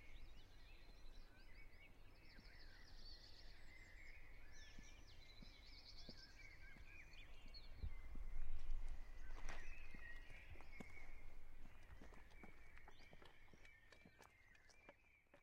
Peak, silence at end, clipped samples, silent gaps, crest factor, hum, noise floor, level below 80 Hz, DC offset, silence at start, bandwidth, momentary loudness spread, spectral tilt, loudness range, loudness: -32 dBFS; 0 s; under 0.1%; none; 18 dB; none; -72 dBFS; -56 dBFS; under 0.1%; 0 s; 7 kHz; 10 LU; -4 dB/octave; 8 LU; -62 LUFS